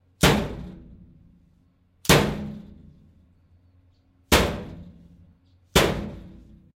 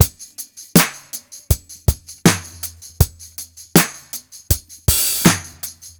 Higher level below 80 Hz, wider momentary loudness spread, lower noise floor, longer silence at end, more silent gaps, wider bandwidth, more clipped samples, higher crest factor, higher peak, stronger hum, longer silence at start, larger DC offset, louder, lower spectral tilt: second, -38 dBFS vs -30 dBFS; first, 23 LU vs 17 LU; first, -62 dBFS vs -37 dBFS; first, 0.5 s vs 0.1 s; neither; second, 16 kHz vs over 20 kHz; neither; about the same, 20 dB vs 20 dB; second, -6 dBFS vs 0 dBFS; neither; first, 0.2 s vs 0 s; neither; second, -22 LUFS vs -17 LUFS; about the same, -4 dB/octave vs -4 dB/octave